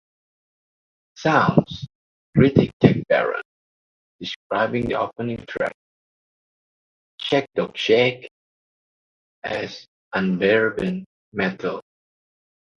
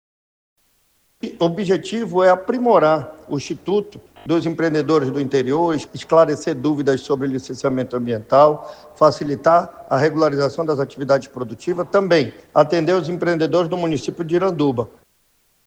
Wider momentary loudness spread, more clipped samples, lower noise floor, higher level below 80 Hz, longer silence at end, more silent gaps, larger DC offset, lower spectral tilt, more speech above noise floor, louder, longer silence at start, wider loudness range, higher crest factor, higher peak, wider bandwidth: first, 16 LU vs 10 LU; neither; first, under -90 dBFS vs -62 dBFS; first, -50 dBFS vs -58 dBFS; first, 0.95 s vs 0.8 s; first, 1.95-2.33 s, 2.73-2.80 s, 3.45-4.19 s, 4.36-4.50 s, 5.74-7.18 s, 8.31-9.42 s, 9.88-10.11 s, 11.06-11.32 s vs none; neither; about the same, -7 dB/octave vs -6.5 dB/octave; first, over 69 dB vs 44 dB; about the same, -21 LUFS vs -19 LUFS; about the same, 1.2 s vs 1.25 s; first, 7 LU vs 2 LU; first, 24 dB vs 18 dB; about the same, 0 dBFS vs 0 dBFS; second, 7.2 kHz vs 9.8 kHz